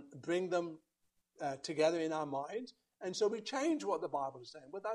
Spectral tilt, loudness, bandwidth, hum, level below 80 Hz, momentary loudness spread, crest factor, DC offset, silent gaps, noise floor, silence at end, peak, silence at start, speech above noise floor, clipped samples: -4.5 dB/octave; -38 LUFS; 11.5 kHz; none; -84 dBFS; 13 LU; 18 dB; under 0.1%; none; -72 dBFS; 0 s; -20 dBFS; 0 s; 35 dB; under 0.1%